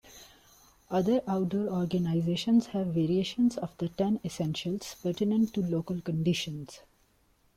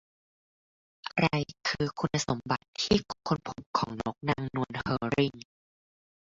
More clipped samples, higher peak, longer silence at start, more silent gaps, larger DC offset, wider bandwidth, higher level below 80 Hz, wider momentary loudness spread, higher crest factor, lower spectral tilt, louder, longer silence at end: neither; second, -16 dBFS vs -10 dBFS; second, 0.05 s vs 1.05 s; second, none vs 2.68-2.73 s, 3.66-3.73 s; neither; first, 15.5 kHz vs 7.8 kHz; second, -62 dBFS vs -56 dBFS; about the same, 8 LU vs 6 LU; second, 14 dB vs 22 dB; first, -6.5 dB/octave vs -5 dB/octave; about the same, -30 LUFS vs -31 LUFS; second, 0.75 s vs 0.95 s